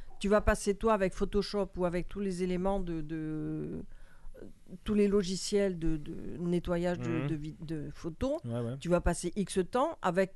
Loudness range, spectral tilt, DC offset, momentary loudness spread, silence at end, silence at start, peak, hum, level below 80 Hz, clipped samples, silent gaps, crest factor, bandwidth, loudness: 3 LU; -6 dB/octave; under 0.1%; 11 LU; 0 s; 0 s; -12 dBFS; none; -44 dBFS; under 0.1%; none; 20 dB; 12.5 kHz; -33 LUFS